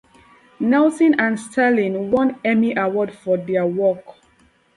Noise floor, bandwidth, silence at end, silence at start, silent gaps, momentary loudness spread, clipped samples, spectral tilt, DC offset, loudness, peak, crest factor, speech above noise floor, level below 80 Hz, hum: -57 dBFS; 11.5 kHz; 0.65 s; 0.6 s; none; 6 LU; under 0.1%; -6.5 dB/octave; under 0.1%; -19 LUFS; -6 dBFS; 14 dB; 39 dB; -60 dBFS; none